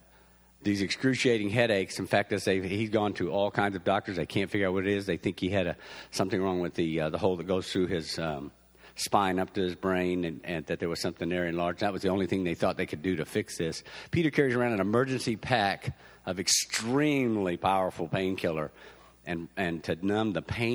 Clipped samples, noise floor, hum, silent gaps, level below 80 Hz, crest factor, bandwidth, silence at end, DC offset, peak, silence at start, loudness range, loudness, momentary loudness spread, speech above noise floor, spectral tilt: under 0.1%; -59 dBFS; none; none; -58 dBFS; 20 dB; over 20 kHz; 0 s; under 0.1%; -8 dBFS; 0.6 s; 3 LU; -29 LUFS; 9 LU; 30 dB; -4.5 dB/octave